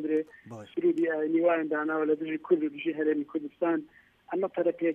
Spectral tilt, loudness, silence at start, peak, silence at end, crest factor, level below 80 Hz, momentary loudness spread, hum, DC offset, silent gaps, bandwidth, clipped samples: -8 dB/octave; -29 LUFS; 0 s; -12 dBFS; 0 s; 16 dB; -78 dBFS; 9 LU; none; under 0.1%; none; 3.6 kHz; under 0.1%